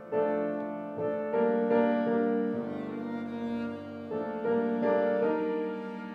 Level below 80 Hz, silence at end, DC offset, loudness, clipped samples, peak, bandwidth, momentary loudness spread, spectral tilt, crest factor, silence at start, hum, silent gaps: -76 dBFS; 0 s; under 0.1%; -30 LUFS; under 0.1%; -14 dBFS; 5.2 kHz; 10 LU; -9 dB/octave; 16 dB; 0 s; none; none